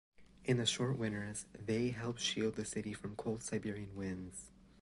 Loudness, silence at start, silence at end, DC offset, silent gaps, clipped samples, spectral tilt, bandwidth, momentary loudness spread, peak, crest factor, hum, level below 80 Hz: -39 LUFS; 0.2 s; 0.3 s; under 0.1%; none; under 0.1%; -4.5 dB/octave; 11.5 kHz; 11 LU; -20 dBFS; 18 dB; none; -64 dBFS